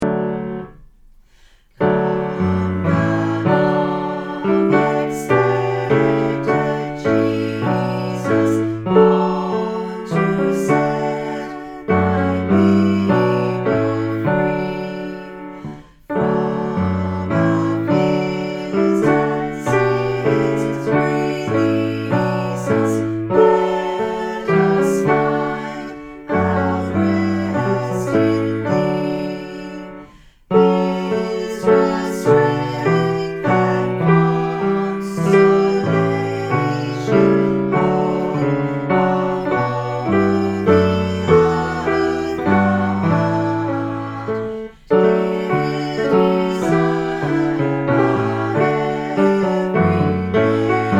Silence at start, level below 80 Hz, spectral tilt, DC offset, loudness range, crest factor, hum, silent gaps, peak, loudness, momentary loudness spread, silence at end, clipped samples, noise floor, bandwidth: 0 s; -46 dBFS; -7.5 dB/octave; under 0.1%; 3 LU; 18 dB; none; none; 0 dBFS; -18 LUFS; 8 LU; 0 s; under 0.1%; -50 dBFS; 12.5 kHz